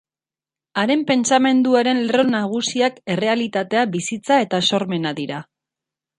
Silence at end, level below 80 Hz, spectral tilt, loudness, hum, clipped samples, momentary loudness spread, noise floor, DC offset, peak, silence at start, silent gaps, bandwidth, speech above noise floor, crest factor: 0.75 s; -66 dBFS; -4 dB/octave; -19 LUFS; none; under 0.1%; 9 LU; under -90 dBFS; under 0.1%; -2 dBFS; 0.75 s; none; 11 kHz; over 72 dB; 18 dB